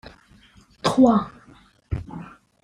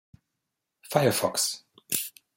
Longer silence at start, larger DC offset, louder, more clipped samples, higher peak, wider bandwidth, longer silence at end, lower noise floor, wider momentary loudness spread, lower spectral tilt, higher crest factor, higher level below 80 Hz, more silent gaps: about the same, 0.85 s vs 0.85 s; neither; first, -21 LUFS vs -27 LUFS; neither; first, -4 dBFS vs -8 dBFS; second, 11 kHz vs 17 kHz; first, 0.4 s vs 0.25 s; second, -53 dBFS vs -83 dBFS; first, 22 LU vs 6 LU; first, -6.5 dB/octave vs -3 dB/octave; about the same, 20 dB vs 22 dB; first, -46 dBFS vs -72 dBFS; neither